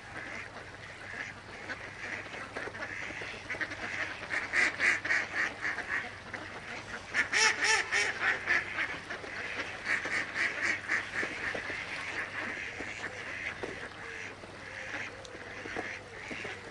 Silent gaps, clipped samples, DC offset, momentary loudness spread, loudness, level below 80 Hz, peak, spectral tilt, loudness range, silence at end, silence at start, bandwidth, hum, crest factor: none; under 0.1%; under 0.1%; 15 LU; -33 LUFS; -62 dBFS; -14 dBFS; -1.5 dB/octave; 10 LU; 0 s; 0 s; 11.5 kHz; none; 22 dB